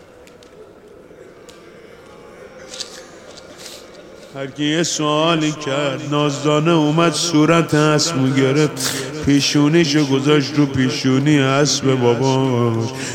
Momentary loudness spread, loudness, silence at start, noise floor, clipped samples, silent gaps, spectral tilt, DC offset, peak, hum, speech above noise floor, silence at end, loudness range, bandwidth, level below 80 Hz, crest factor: 17 LU; -16 LUFS; 0.55 s; -43 dBFS; under 0.1%; none; -5 dB/octave; under 0.1%; -2 dBFS; none; 27 dB; 0 s; 20 LU; 16.5 kHz; -54 dBFS; 16 dB